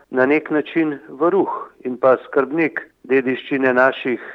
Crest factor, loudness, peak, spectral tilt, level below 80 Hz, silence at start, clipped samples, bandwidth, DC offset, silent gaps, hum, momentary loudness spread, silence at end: 16 dB; -19 LUFS; -2 dBFS; -8 dB/octave; -70 dBFS; 0.1 s; under 0.1%; 5.8 kHz; under 0.1%; none; none; 8 LU; 0 s